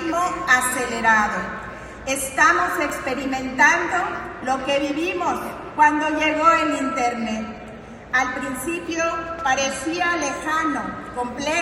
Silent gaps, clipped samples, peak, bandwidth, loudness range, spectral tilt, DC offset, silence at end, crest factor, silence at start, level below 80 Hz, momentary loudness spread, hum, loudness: none; under 0.1%; -4 dBFS; 16 kHz; 4 LU; -3 dB/octave; under 0.1%; 0 s; 18 dB; 0 s; -48 dBFS; 12 LU; none; -21 LUFS